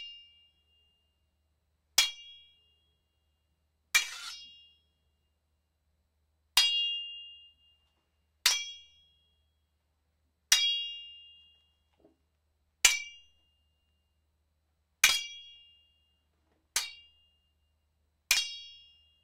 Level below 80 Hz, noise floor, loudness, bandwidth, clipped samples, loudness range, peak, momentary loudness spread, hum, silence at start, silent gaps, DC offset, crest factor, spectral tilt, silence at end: -70 dBFS; -78 dBFS; -28 LUFS; 16 kHz; under 0.1%; 6 LU; -4 dBFS; 22 LU; none; 0 s; none; under 0.1%; 34 dB; 4 dB/octave; 0.5 s